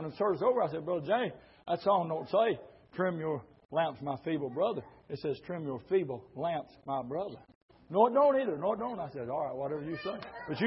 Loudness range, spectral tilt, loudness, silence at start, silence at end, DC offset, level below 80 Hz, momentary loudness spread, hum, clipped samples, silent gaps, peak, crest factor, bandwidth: 4 LU; -10 dB/octave; -33 LUFS; 0 s; 0 s; under 0.1%; -70 dBFS; 12 LU; none; under 0.1%; 3.65-3.69 s, 7.55-7.69 s; -12 dBFS; 20 dB; 5.8 kHz